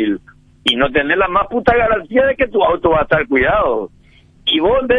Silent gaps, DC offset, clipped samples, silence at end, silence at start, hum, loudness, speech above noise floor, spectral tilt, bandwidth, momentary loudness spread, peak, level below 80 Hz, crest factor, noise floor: none; under 0.1%; under 0.1%; 0 s; 0 s; none; -15 LUFS; 32 dB; -6 dB/octave; 10.5 kHz; 7 LU; 0 dBFS; -36 dBFS; 14 dB; -46 dBFS